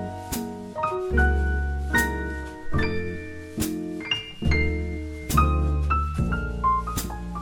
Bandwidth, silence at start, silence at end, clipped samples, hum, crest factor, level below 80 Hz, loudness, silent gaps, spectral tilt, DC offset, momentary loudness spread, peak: 17.5 kHz; 0 s; 0 s; under 0.1%; none; 18 dB; -28 dBFS; -26 LUFS; none; -5.5 dB/octave; under 0.1%; 10 LU; -6 dBFS